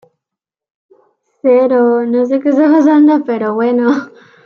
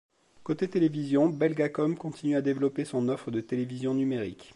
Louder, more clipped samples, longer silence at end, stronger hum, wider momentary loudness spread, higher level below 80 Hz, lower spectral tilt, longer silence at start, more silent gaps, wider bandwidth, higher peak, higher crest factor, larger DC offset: first, -11 LUFS vs -29 LUFS; neither; first, 0.35 s vs 0.1 s; neither; about the same, 7 LU vs 7 LU; about the same, -68 dBFS vs -68 dBFS; about the same, -7 dB/octave vs -7.5 dB/octave; first, 1.45 s vs 0.4 s; neither; second, 6.8 kHz vs 11.5 kHz; first, -2 dBFS vs -12 dBFS; second, 10 dB vs 16 dB; neither